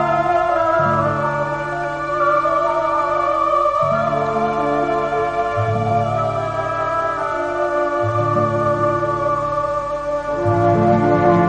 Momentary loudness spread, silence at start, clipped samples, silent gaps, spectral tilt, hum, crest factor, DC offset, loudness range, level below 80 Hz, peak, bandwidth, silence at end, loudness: 6 LU; 0 s; under 0.1%; none; -7.5 dB/octave; none; 16 dB; 0.1%; 2 LU; -44 dBFS; -2 dBFS; 9.2 kHz; 0 s; -18 LUFS